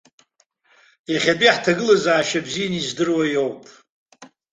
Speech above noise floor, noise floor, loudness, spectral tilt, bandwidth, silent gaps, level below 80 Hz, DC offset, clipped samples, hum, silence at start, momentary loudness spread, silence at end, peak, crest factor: 44 dB; -63 dBFS; -19 LUFS; -4 dB/octave; 9.4 kHz; 3.90-4.06 s; -62 dBFS; under 0.1%; under 0.1%; none; 1.1 s; 10 LU; 0.3 s; 0 dBFS; 20 dB